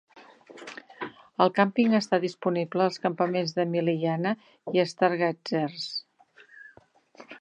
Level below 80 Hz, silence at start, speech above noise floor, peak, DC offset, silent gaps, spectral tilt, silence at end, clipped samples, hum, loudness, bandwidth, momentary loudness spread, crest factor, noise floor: -80 dBFS; 0.15 s; 32 dB; -6 dBFS; under 0.1%; none; -6 dB/octave; 0.05 s; under 0.1%; none; -26 LUFS; 9.6 kHz; 17 LU; 22 dB; -58 dBFS